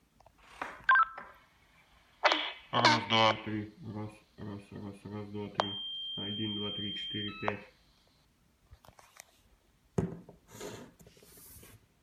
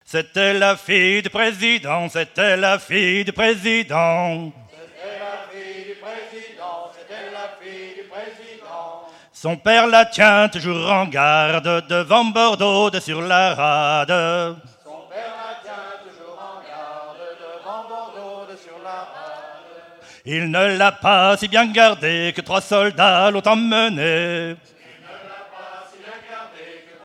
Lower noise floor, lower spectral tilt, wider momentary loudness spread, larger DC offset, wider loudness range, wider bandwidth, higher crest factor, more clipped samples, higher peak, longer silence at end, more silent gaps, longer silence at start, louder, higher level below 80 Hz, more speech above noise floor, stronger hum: first, -69 dBFS vs -44 dBFS; about the same, -4 dB/octave vs -4 dB/octave; about the same, 24 LU vs 22 LU; neither; second, 16 LU vs 19 LU; first, 16 kHz vs 13 kHz; first, 26 dB vs 20 dB; neither; second, -10 dBFS vs 0 dBFS; about the same, 0.25 s vs 0.25 s; neither; first, 0.5 s vs 0.1 s; second, -32 LUFS vs -16 LUFS; about the same, -64 dBFS vs -62 dBFS; first, 35 dB vs 27 dB; neither